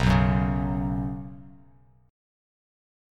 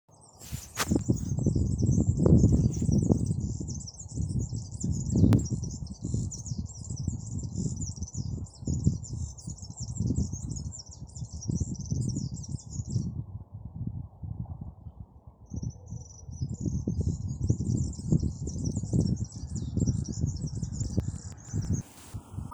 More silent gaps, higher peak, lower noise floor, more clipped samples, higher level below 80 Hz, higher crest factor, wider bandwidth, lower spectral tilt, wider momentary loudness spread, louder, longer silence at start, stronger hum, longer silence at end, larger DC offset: neither; about the same, -8 dBFS vs -8 dBFS; first, -57 dBFS vs -51 dBFS; neither; about the same, -36 dBFS vs -40 dBFS; about the same, 20 dB vs 22 dB; second, 10 kHz vs over 20 kHz; about the same, -7.5 dB/octave vs -6.5 dB/octave; first, 20 LU vs 16 LU; first, -26 LUFS vs -31 LUFS; second, 0 s vs 0.35 s; neither; first, 1.6 s vs 0 s; neither